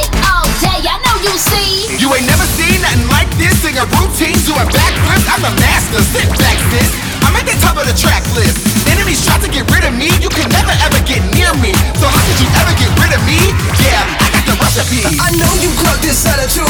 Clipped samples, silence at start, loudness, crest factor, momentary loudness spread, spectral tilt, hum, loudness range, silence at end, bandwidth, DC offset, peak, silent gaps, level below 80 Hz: under 0.1%; 0 s; -10 LUFS; 10 dB; 2 LU; -3.5 dB/octave; none; 1 LU; 0 s; over 20 kHz; under 0.1%; 0 dBFS; none; -18 dBFS